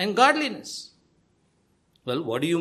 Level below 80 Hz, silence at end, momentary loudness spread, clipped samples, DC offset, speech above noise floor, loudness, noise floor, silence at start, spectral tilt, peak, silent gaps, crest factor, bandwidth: -70 dBFS; 0 s; 19 LU; under 0.1%; under 0.1%; 43 dB; -24 LUFS; -67 dBFS; 0 s; -4 dB/octave; -6 dBFS; none; 20 dB; 14 kHz